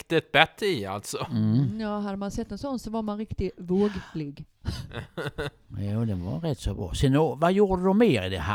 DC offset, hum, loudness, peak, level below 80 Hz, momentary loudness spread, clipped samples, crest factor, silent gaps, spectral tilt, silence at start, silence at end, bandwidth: under 0.1%; none; -27 LUFS; 0 dBFS; -44 dBFS; 14 LU; under 0.1%; 26 dB; none; -6 dB/octave; 0.1 s; 0 s; 16.5 kHz